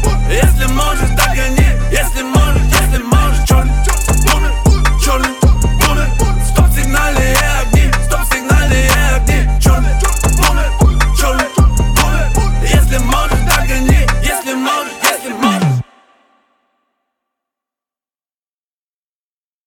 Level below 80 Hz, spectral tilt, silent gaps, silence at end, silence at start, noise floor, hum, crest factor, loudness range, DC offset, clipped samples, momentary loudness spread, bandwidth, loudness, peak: -14 dBFS; -4.5 dB/octave; none; 3.85 s; 0 s; under -90 dBFS; none; 10 dB; 5 LU; under 0.1%; under 0.1%; 3 LU; 18 kHz; -13 LUFS; 0 dBFS